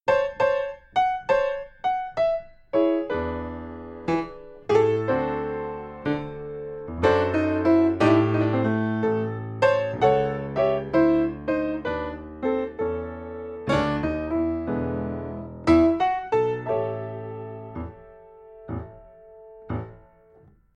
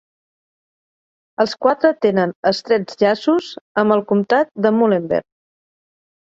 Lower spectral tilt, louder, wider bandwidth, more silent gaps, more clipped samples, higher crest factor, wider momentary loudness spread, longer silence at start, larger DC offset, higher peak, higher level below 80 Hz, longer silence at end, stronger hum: first, -8 dB/octave vs -6.5 dB/octave; second, -24 LUFS vs -17 LUFS; about the same, 8 kHz vs 7.8 kHz; second, none vs 2.35-2.43 s, 3.61-3.75 s; neither; about the same, 18 dB vs 16 dB; first, 15 LU vs 6 LU; second, 0.05 s vs 1.4 s; neither; second, -6 dBFS vs -2 dBFS; first, -46 dBFS vs -62 dBFS; second, 0.8 s vs 1.1 s; neither